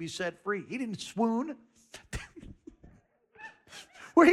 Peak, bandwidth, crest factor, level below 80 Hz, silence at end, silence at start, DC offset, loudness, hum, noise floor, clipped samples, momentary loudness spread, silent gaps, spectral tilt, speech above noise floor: -10 dBFS; 12.5 kHz; 22 dB; -56 dBFS; 0 s; 0 s; under 0.1%; -32 LUFS; none; -62 dBFS; under 0.1%; 22 LU; none; -5 dB/octave; 29 dB